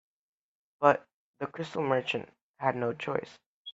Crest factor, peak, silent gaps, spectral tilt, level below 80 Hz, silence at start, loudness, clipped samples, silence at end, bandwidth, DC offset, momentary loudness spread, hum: 26 dB; -6 dBFS; 1.13-1.34 s, 2.41-2.54 s, 3.46-3.65 s; -6 dB/octave; -74 dBFS; 0.8 s; -31 LUFS; under 0.1%; 0 s; 8 kHz; under 0.1%; 17 LU; none